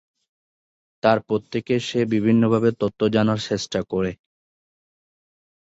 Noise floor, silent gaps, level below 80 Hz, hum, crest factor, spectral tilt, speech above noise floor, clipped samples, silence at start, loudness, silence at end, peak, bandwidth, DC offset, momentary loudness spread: under -90 dBFS; none; -54 dBFS; none; 20 dB; -6.5 dB/octave; over 69 dB; under 0.1%; 1.05 s; -22 LUFS; 1.65 s; -4 dBFS; 8 kHz; under 0.1%; 7 LU